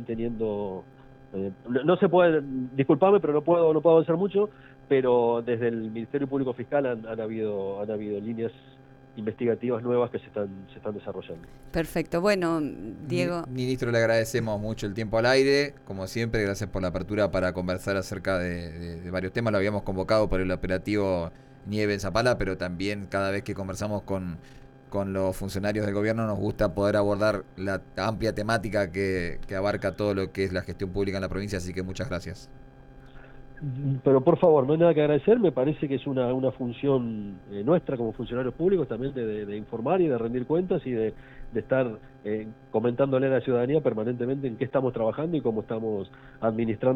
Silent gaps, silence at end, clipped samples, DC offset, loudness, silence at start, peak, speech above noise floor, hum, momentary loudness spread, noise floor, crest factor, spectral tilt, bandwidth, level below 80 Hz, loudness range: none; 0 s; under 0.1%; under 0.1%; -27 LUFS; 0 s; -8 dBFS; 22 dB; none; 13 LU; -48 dBFS; 18 dB; -6.5 dB/octave; 16 kHz; -48 dBFS; 7 LU